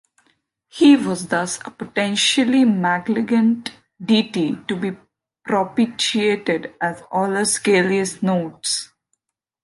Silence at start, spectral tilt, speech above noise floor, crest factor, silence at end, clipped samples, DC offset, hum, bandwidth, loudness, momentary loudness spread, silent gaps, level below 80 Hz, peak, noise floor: 0.75 s; -4 dB/octave; 54 dB; 16 dB; 0.8 s; under 0.1%; under 0.1%; none; 11.5 kHz; -19 LUFS; 11 LU; none; -64 dBFS; -4 dBFS; -73 dBFS